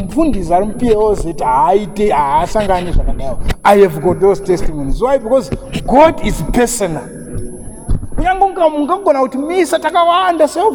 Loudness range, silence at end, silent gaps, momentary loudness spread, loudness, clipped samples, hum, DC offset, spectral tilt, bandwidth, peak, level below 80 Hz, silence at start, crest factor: 3 LU; 0 s; none; 12 LU; -13 LUFS; under 0.1%; none; under 0.1%; -5.5 dB/octave; 20 kHz; 0 dBFS; -24 dBFS; 0 s; 12 dB